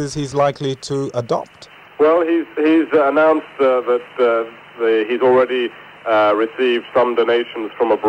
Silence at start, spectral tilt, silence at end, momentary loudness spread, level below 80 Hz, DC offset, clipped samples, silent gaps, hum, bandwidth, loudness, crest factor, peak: 0 s; -6 dB/octave; 0 s; 9 LU; -56 dBFS; under 0.1%; under 0.1%; none; none; 10 kHz; -17 LUFS; 12 dB; -6 dBFS